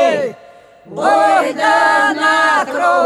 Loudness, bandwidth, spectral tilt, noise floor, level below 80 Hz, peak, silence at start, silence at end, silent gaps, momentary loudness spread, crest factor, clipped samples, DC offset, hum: -13 LUFS; 14 kHz; -3 dB/octave; -42 dBFS; -68 dBFS; -2 dBFS; 0 s; 0 s; none; 8 LU; 12 dB; under 0.1%; under 0.1%; none